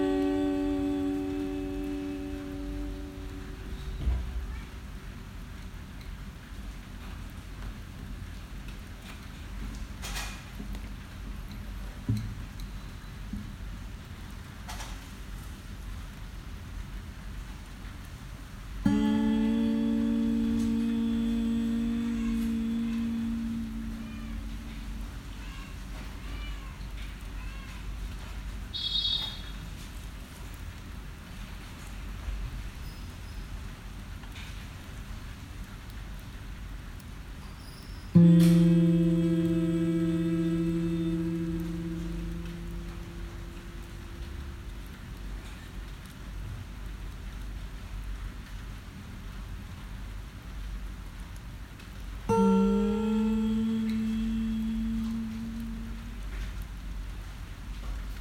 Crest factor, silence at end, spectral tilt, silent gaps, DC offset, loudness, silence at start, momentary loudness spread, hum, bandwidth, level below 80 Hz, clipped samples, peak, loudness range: 24 dB; 0 s; -7 dB/octave; none; under 0.1%; -32 LUFS; 0 s; 17 LU; none; 16 kHz; -40 dBFS; under 0.1%; -8 dBFS; 17 LU